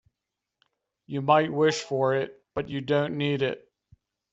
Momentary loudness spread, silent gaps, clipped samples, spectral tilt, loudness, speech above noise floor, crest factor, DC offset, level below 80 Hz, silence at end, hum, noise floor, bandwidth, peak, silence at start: 11 LU; none; under 0.1%; -4.5 dB/octave; -26 LUFS; 61 dB; 20 dB; under 0.1%; -66 dBFS; 0.75 s; none; -86 dBFS; 8 kHz; -6 dBFS; 1.1 s